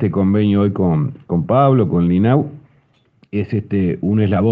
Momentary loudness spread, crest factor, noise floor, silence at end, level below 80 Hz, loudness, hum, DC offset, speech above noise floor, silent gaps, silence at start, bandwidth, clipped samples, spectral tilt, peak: 8 LU; 16 dB; -56 dBFS; 0 s; -52 dBFS; -16 LUFS; none; under 0.1%; 41 dB; none; 0 s; 4.8 kHz; under 0.1%; -11.5 dB/octave; 0 dBFS